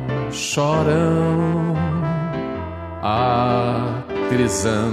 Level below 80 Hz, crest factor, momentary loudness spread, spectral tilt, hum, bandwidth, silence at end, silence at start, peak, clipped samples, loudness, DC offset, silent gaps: -42 dBFS; 16 dB; 8 LU; -6 dB/octave; none; 13.5 kHz; 0 s; 0 s; -4 dBFS; under 0.1%; -20 LUFS; under 0.1%; none